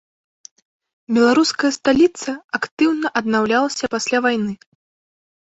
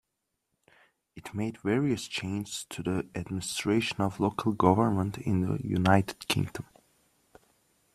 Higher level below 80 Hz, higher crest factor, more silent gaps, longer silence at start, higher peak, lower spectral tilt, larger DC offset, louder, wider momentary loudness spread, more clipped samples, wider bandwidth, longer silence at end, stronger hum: about the same, -60 dBFS vs -60 dBFS; second, 18 dB vs 24 dB; first, 2.44-2.49 s, 2.71-2.77 s vs none; about the same, 1.1 s vs 1.15 s; first, -2 dBFS vs -6 dBFS; second, -3.5 dB/octave vs -5.5 dB/octave; neither; first, -18 LUFS vs -29 LUFS; about the same, 10 LU vs 11 LU; neither; second, 8.2 kHz vs 14 kHz; second, 1.05 s vs 1.35 s; neither